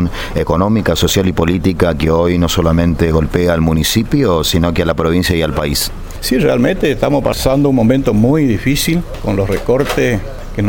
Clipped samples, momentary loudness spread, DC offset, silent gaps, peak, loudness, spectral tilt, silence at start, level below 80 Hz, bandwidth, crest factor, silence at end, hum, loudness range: under 0.1%; 5 LU; under 0.1%; none; 0 dBFS; -13 LUFS; -5.5 dB/octave; 0 s; -26 dBFS; 17 kHz; 12 dB; 0 s; none; 1 LU